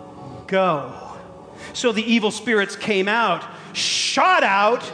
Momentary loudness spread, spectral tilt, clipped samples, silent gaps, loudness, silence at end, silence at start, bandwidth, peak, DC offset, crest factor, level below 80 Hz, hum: 21 LU; -3 dB/octave; under 0.1%; none; -19 LUFS; 0 s; 0 s; 10.5 kHz; -6 dBFS; under 0.1%; 16 dB; -62 dBFS; none